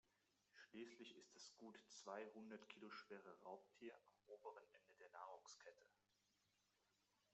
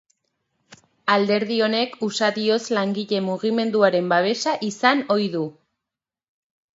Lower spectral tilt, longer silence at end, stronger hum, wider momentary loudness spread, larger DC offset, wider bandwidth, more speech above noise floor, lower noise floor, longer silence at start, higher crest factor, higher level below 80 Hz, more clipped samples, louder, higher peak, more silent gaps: second, -2 dB/octave vs -4.5 dB/octave; second, 0 s vs 1.25 s; neither; about the same, 8 LU vs 6 LU; neither; about the same, 8 kHz vs 8 kHz; second, 25 dB vs 67 dB; about the same, -87 dBFS vs -88 dBFS; second, 0.05 s vs 0.7 s; about the same, 22 dB vs 20 dB; second, under -90 dBFS vs -74 dBFS; neither; second, -61 LUFS vs -21 LUFS; second, -40 dBFS vs -4 dBFS; neither